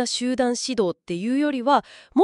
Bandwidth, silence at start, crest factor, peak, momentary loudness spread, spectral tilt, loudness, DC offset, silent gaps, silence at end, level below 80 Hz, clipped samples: 11.5 kHz; 0 s; 16 dB; -6 dBFS; 5 LU; -4 dB/octave; -23 LUFS; under 0.1%; none; 0 s; -62 dBFS; under 0.1%